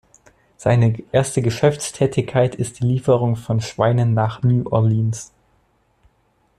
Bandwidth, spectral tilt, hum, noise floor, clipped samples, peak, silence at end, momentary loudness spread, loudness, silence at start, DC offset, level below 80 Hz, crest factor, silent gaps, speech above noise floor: 12 kHz; -6.5 dB/octave; none; -62 dBFS; under 0.1%; -4 dBFS; 1.35 s; 6 LU; -19 LUFS; 0.6 s; under 0.1%; -50 dBFS; 16 dB; none; 44 dB